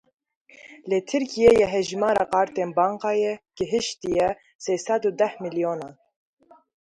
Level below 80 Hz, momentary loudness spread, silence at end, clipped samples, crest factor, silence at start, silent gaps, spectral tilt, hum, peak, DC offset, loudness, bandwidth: -56 dBFS; 10 LU; 0.9 s; under 0.1%; 20 dB; 0.65 s; 4.55-4.59 s; -4.5 dB/octave; none; -4 dBFS; under 0.1%; -23 LUFS; 11 kHz